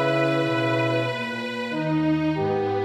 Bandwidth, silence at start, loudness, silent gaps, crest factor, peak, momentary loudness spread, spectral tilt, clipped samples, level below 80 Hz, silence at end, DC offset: 11.5 kHz; 0 s; -24 LUFS; none; 12 dB; -10 dBFS; 6 LU; -7 dB/octave; under 0.1%; -56 dBFS; 0 s; under 0.1%